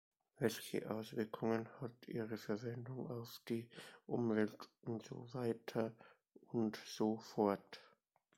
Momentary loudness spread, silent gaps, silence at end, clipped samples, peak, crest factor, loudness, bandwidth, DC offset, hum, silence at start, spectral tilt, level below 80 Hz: 11 LU; none; 0.5 s; under 0.1%; -22 dBFS; 20 dB; -43 LUFS; 16.5 kHz; under 0.1%; none; 0.4 s; -6 dB/octave; -82 dBFS